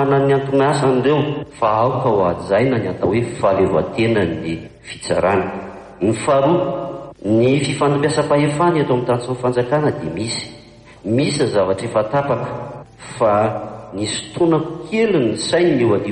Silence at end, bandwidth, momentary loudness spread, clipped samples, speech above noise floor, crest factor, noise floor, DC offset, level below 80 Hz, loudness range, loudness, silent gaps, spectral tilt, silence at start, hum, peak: 0 s; 10 kHz; 12 LU; under 0.1%; 25 dB; 14 dB; -42 dBFS; under 0.1%; -48 dBFS; 3 LU; -18 LUFS; none; -6 dB/octave; 0 s; none; -4 dBFS